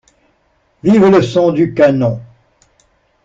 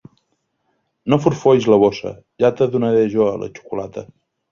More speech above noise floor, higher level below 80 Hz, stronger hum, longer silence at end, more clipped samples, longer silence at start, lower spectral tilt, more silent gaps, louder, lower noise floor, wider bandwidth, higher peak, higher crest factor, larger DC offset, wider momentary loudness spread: second, 48 dB vs 53 dB; about the same, -50 dBFS vs -54 dBFS; neither; first, 1 s vs 0.5 s; neither; second, 0.85 s vs 1.05 s; about the same, -7.5 dB/octave vs -7.5 dB/octave; neither; first, -12 LUFS vs -17 LUFS; second, -58 dBFS vs -69 dBFS; about the same, 7.8 kHz vs 7.2 kHz; about the same, -2 dBFS vs -2 dBFS; about the same, 12 dB vs 16 dB; neither; second, 10 LU vs 16 LU